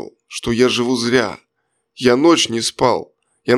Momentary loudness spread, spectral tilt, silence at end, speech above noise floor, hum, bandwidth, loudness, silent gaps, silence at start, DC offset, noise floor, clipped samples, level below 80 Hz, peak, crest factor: 14 LU; -4 dB/octave; 0 s; 55 dB; none; 13.5 kHz; -16 LUFS; none; 0 s; under 0.1%; -71 dBFS; under 0.1%; -50 dBFS; 0 dBFS; 16 dB